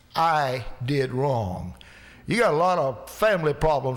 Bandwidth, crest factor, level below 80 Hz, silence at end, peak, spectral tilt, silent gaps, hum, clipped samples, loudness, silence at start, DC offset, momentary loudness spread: 19.5 kHz; 12 dB; -44 dBFS; 0 s; -12 dBFS; -6 dB/octave; none; none; under 0.1%; -24 LUFS; 0.15 s; under 0.1%; 10 LU